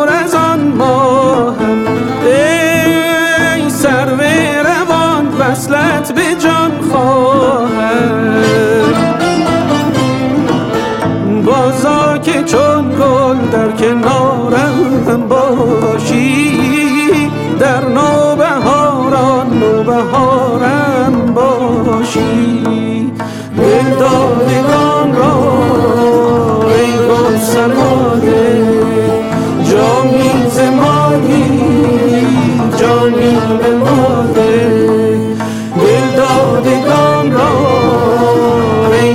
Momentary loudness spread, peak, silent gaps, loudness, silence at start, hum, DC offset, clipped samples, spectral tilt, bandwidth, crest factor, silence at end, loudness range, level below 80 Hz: 3 LU; 0 dBFS; none; -10 LUFS; 0 s; none; under 0.1%; under 0.1%; -6 dB/octave; 16.5 kHz; 8 dB; 0 s; 2 LU; -40 dBFS